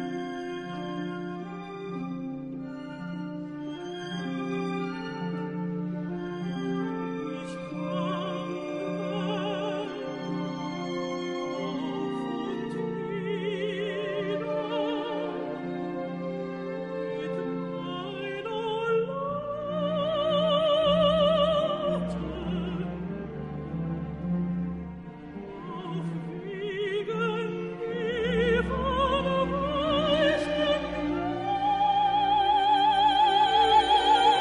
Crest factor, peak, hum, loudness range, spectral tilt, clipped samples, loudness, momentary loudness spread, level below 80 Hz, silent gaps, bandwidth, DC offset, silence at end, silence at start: 18 dB; -10 dBFS; none; 9 LU; -6 dB/octave; under 0.1%; -29 LUFS; 14 LU; -50 dBFS; none; 10.5 kHz; under 0.1%; 0 s; 0 s